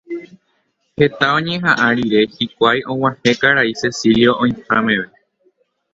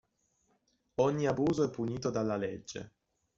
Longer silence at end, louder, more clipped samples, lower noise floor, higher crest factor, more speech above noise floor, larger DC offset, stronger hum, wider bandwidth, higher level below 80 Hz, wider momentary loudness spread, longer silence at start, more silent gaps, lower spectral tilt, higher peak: first, 0.9 s vs 0.5 s; first, -15 LUFS vs -33 LUFS; neither; second, -65 dBFS vs -76 dBFS; about the same, 16 dB vs 20 dB; first, 50 dB vs 44 dB; neither; neither; about the same, 7.8 kHz vs 7.8 kHz; first, -50 dBFS vs -64 dBFS; second, 7 LU vs 14 LU; second, 0.1 s vs 1 s; neither; second, -5 dB/octave vs -6.5 dB/octave; first, 0 dBFS vs -14 dBFS